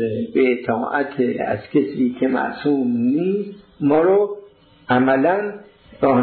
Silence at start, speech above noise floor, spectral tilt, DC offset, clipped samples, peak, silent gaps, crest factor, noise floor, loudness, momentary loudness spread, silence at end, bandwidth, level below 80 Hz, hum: 0 s; 28 dB; -11 dB/octave; under 0.1%; under 0.1%; -6 dBFS; none; 14 dB; -46 dBFS; -19 LUFS; 8 LU; 0 s; 4.5 kHz; -60 dBFS; none